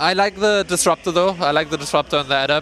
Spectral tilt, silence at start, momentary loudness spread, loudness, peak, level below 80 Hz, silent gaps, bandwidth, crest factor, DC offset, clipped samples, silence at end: -3 dB/octave; 0 s; 3 LU; -18 LUFS; -2 dBFS; -48 dBFS; none; 15 kHz; 18 dB; under 0.1%; under 0.1%; 0 s